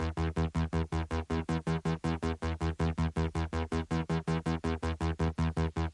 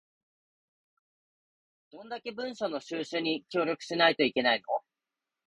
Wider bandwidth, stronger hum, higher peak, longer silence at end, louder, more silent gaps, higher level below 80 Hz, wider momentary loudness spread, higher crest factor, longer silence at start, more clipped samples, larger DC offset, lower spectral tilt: about the same, 11 kHz vs 11.5 kHz; neither; second, -20 dBFS vs -10 dBFS; second, 0 s vs 0.7 s; second, -33 LUFS vs -30 LUFS; neither; first, -42 dBFS vs -78 dBFS; second, 2 LU vs 13 LU; second, 12 dB vs 24 dB; second, 0 s vs 1.95 s; neither; neither; first, -7 dB/octave vs -4 dB/octave